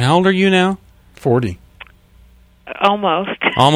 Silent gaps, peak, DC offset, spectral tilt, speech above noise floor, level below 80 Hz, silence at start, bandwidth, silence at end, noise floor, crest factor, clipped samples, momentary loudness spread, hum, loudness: none; 0 dBFS; under 0.1%; -6 dB/octave; 33 dB; -48 dBFS; 0 s; 13 kHz; 0 s; -47 dBFS; 16 dB; under 0.1%; 15 LU; none; -16 LUFS